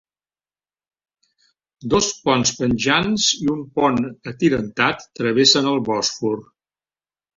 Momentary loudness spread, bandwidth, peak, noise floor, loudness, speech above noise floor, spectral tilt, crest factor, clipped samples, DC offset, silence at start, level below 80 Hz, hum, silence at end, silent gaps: 10 LU; 7.8 kHz; -2 dBFS; under -90 dBFS; -19 LUFS; over 71 dB; -3.5 dB/octave; 20 dB; under 0.1%; under 0.1%; 1.8 s; -50 dBFS; none; 0.95 s; none